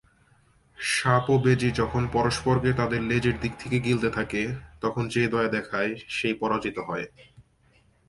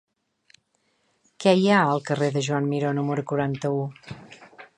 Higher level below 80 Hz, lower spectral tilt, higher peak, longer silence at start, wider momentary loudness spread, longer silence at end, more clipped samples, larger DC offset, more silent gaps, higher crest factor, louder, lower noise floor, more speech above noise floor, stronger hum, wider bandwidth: first, -48 dBFS vs -66 dBFS; about the same, -6 dB/octave vs -6 dB/octave; about the same, -6 dBFS vs -4 dBFS; second, 0.8 s vs 1.4 s; second, 9 LU vs 15 LU; first, 0.65 s vs 0.15 s; neither; neither; neither; about the same, 20 dB vs 20 dB; second, -26 LUFS vs -23 LUFS; second, -62 dBFS vs -70 dBFS; second, 37 dB vs 47 dB; neither; about the same, 11.5 kHz vs 10.5 kHz